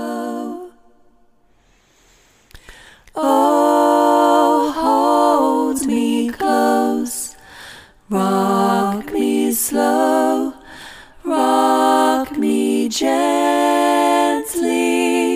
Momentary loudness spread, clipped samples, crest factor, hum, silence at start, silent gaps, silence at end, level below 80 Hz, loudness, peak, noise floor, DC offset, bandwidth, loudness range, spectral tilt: 15 LU; under 0.1%; 14 dB; none; 0 s; none; 0 s; -52 dBFS; -16 LUFS; -2 dBFS; -55 dBFS; under 0.1%; 16 kHz; 4 LU; -4 dB/octave